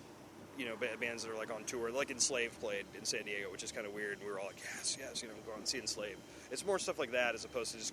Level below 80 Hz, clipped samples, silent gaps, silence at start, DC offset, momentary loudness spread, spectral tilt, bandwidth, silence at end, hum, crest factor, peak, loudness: -70 dBFS; under 0.1%; none; 0 s; under 0.1%; 10 LU; -1.5 dB/octave; over 20 kHz; 0 s; none; 22 dB; -20 dBFS; -39 LUFS